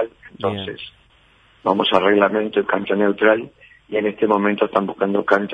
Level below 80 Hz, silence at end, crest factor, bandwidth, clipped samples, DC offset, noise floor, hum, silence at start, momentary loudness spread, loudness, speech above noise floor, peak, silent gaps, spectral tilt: -60 dBFS; 0 s; 18 dB; 6.8 kHz; under 0.1%; under 0.1%; -54 dBFS; none; 0 s; 12 LU; -19 LUFS; 36 dB; 0 dBFS; none; -7 dB/octave